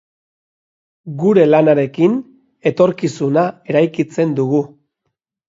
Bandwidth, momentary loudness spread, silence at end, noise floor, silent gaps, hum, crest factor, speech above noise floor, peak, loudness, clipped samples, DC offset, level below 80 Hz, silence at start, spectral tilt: 7.8 kHz; 10 LU; 0.85 s; -74 dBFS; none; none; 16 dB; 60 dB; 0 dBFS; -15 LUFS; under 0.1%; under 0.1%; -62 dBFS; 1.05 s; -7.5 dB/octave